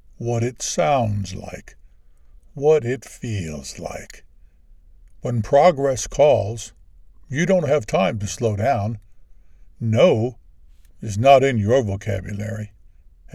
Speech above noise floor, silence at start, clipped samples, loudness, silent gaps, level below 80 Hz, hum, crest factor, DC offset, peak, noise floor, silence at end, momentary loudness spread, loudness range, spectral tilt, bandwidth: 29 dB; 0.2 s; under 0.1%; -20 LUFS; none; -46 dBFS; none; 22 dB; under 0.1%; 0 dBFS; -48 dBFS; 0.65 s; 17 LU; 6 LU; -5.5 dB/octave; 13.5 kHz